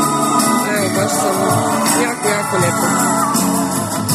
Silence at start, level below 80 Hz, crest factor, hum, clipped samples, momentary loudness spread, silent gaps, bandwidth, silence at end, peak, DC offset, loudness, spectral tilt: 0 s; -54 dBFS; 14 dB; none; under 0.1%; 2 LU; none; 14 kHz; 0 s; 0 dBFS; under 0.1%; -15 LUFS; -4 dB/octave